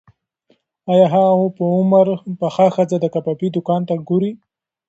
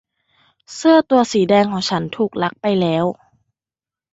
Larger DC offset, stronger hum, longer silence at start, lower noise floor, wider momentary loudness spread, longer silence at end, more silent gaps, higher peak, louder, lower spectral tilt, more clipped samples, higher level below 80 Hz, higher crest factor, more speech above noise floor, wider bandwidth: neither; neither; first, 0.85 s vs 0.7 s; second, -61 dBFS vs under -90 dBFS; about the same, 8 LU vs 9 LU; second, 0.5 s vs 1 s; neither; about the same, 0 dBFS vs -2 dBFS; about the same, -17 LUFS vs -17 LUFS; first, -8.5 dB/octave vs -5.5 dB/octave; neither; second, -64 dBFS vs -58 dBFS; about the same, 16 dB vs 16 dB; second, 46 dB vs over 74 dB; about the same, 8 kHz vs 8 kHz